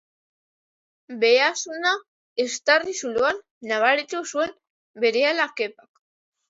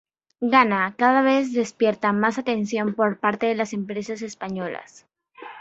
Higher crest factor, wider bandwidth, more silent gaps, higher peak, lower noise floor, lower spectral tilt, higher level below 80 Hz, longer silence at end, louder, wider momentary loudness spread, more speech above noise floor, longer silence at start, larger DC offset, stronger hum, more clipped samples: about the same, 20 dB vs 22 dB; about the same, 8 kHz vs 8 kHz; first, 2.08-2.36 s, 3.51-3.61 s, 4.70-4.94 s vs none; about the same, -4 dBFS vs -2 dBFS; first, under -90 dBFS vs -43 dBFS; second, -1 dB/octave vs -5.5 dB/octave; about the same, -70 dBFS vs -68 dBFS; first, 0.8 s vs 0 s; about the same, -22 LUFS vs -22 LUFS; second, 10 LU vs 13 LU; first, over 67 dB vs 21 dB; first, 1.1 s vs 0.4 s; neither; neither; neither